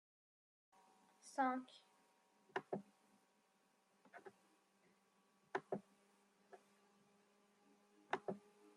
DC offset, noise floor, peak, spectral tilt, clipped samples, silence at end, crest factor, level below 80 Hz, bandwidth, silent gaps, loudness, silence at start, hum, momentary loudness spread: under 0.1%; -79 dBFS; -26 dBFS; -5 dB/octave; under 0.1%; 0.05 s; 28 dB; under -90 dBFS; 12 kHz; none; -47 LUFS; 1.25 s; none; 25 LU